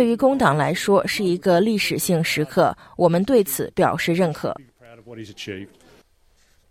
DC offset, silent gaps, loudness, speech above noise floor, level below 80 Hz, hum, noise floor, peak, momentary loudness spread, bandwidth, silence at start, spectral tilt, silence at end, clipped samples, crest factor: under 0.1%; none; -20 LUFS; 39 dB; -54 dBFS; none; -59 dBFS; -4 dBFS; 15 LU; 16.5 kHz; 0 s; -5 dB/octave; 1.05 s; under 0.1%; 18 dB